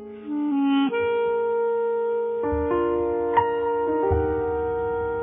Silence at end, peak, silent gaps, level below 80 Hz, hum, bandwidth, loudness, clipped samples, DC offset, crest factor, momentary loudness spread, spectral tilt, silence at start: 0 s; -6 dBFS; none; -42 dBFS; none; 3.7 kHz; -24 LUFS; under 0.1%; under 0.1%; 16 dB; 4 LU; -6 dB/octave; 0 s